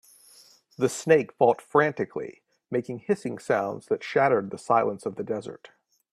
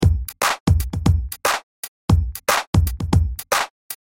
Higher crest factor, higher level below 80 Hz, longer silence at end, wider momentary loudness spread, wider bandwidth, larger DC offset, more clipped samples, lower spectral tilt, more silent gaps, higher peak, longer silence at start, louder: about the same, 20 dB vs 16 dB; second, -70 dBFS vs -26 dBFS; first, 0.6 s vs 0.25 s; first, 11 LU vs 8 LU; second, 13.5 kHz vs 17 kHz; neither; neither; about the same, -5.5 dB/octave vs -5 dB/octave; second, none vs 0.60-0.66 s, 1.63-2.08 s, 2.67-2.73 s, 3.70-3.90 s; about the same, -6 dBFS vs -4 dBFS; first, 0.8 s vs 0 s; second, -26 LUFS vs -21 LUFS